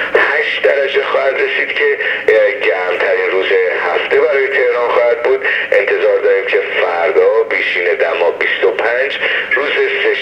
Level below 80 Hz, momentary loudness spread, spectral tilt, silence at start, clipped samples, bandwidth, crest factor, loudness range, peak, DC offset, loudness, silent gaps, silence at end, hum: -60 dBFS; 3 LU; -3.5 dB/octave; 0 s; under 0.1%; 8.4 kHz; 14 dB; 1 LU; 0 dBFS; under 0.1%; -13 LUFS; none; 0 s; none